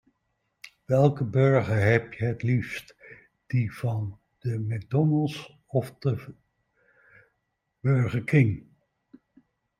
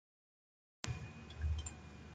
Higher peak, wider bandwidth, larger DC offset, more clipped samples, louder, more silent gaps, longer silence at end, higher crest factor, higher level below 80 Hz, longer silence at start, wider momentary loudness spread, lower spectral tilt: first, -6 dBFS vs -18 dBFS; first, 11.5 kHz vs 9.4 kHz; neither; neither; first, -26 LUFS vs -46 LUFS; neither; first, 1.2 s vs 0 s; second, 22 dB vs 28 dB; second, -60 dBFS vs -50 dBFS; about the same, 0.9 s vs 0.85 s; first, 13 LU vs 9 LU; first, -8.5 dB/octave vs -4.5 dB/octave